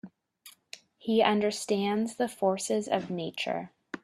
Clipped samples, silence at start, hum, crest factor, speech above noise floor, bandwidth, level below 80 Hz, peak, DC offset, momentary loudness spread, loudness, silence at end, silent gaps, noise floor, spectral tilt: under 0.1%; 0.05 s; none; 22 dB; 28 dB; 14 kHz; -74 dBFS; -8 dBFS; under 0.1%; 17 LU; -29 LUFS; 0.05 s; none; -57 dBFS; -4.5 dB/octave